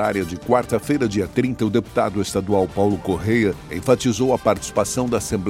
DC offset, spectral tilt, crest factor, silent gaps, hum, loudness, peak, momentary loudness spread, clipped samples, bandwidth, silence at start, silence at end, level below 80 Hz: under 0.1%; -5.5 dB/octave; 18 dB; none; none; -20 LUFS; -2 dBFS; 3 LU; under 0.1%; 16.5 kHz; 0 s; 0 s; -44 dBFS